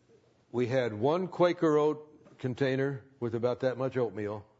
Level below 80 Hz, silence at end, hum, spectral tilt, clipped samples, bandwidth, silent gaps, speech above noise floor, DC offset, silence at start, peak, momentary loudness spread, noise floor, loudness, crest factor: -74 dBFS; 0.15 s; none; -7.5 dB/octave; under 0.1%; 7.8 kHz; none; 34 dB; under 0.1%; 0.55 s; -12 dBFS; 11 LU; -64 dBFS; -30 LUFS; 18 dB